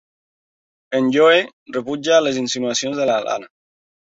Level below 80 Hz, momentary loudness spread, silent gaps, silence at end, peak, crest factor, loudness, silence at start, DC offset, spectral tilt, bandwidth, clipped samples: -66 dBFS; 12 LU; 1.53-1.66 s; 0.6 s; -2 dBFS; 18 dB; -18 LUFS; 0.9 s; under 0.1%; -3 dB/octave; 8 kHz; under 0.1%